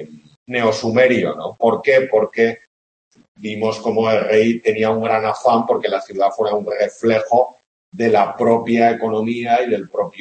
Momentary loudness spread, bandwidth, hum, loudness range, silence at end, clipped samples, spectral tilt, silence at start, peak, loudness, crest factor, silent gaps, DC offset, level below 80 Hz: 7 LU; 8.6 kHz; none; 1 LU; 0 s; under 0.1%; -6 dB/octave; 0 s; 0 dBFS; -17 LUFS; 16 dB; 0.36-0.46 s, 2.67-3.11 s, 3.28-3.35 s, 7.66-7.92 s; under 0.1%; -64 dBFS